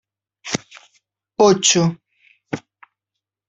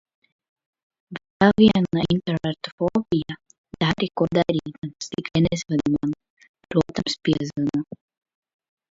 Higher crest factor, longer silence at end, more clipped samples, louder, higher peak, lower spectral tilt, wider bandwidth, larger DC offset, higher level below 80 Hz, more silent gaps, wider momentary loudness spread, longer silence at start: about the same, 20 dB vs 22 dB; second, 0.9 s vs 1.1 s; neither; first, -17 LUFS vs -23 LUFS; about the same, 0 dBFS vs -2 dBFS; second, -3.5 dB/octave vs -6.5 dB/octave; about the same, 8.2 kHz vs 7.8 kHz; neither; second, -60 dBFS vs -50 dBFS; second, none vs 1.30-1.40 s, 2.72-2.78 s, 3.58-3.64 s, 4.78-4.82 s, 6.30-6.37 s, 6.49-6.54 s; first, 22 LU vs 17 LU; second, 0.45 s vs 1.1 s